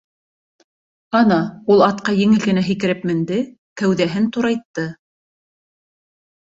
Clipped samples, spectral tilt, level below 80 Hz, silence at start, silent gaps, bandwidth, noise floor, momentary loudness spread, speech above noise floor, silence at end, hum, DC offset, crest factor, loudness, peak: under 0.1%; -6.5 dB/octave; -58 dBFS; 1.1 s; 3.58-3.76 s, 4.65-4.74 s; 7.8 kHz; under -90 dBFS; 10 LU; over 73 dB; 1.6 s; none; under 0.1%; 18 dB; -18 LUFS; -2 dBFS